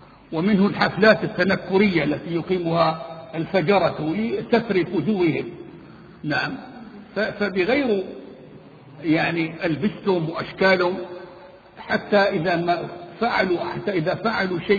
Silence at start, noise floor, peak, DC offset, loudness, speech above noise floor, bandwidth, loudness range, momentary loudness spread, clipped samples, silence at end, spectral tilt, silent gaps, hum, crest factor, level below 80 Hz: 0.3 s; -44 dBFS; -2 dBFS; under 0.1%; -22 LUFS; 23 dB; 7 kHz; 4 LU; 16 LU; under 0.1%; 0 s; -7.5 dB/octave; none; none; 20 dB; -56 dBFS